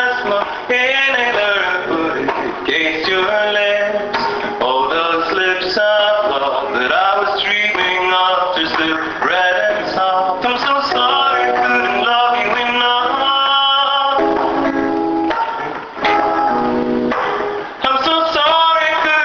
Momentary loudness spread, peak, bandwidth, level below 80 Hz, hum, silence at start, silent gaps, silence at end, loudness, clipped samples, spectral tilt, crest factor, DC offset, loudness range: 6 LU; -2 dBFS; 7.2 kHz; -50 dBFS; none; 0 s; none; 0 s; -15 LUFS; under 0.1%; -3.5 dB/octave; 14 dB; under 0.1%; 3 LU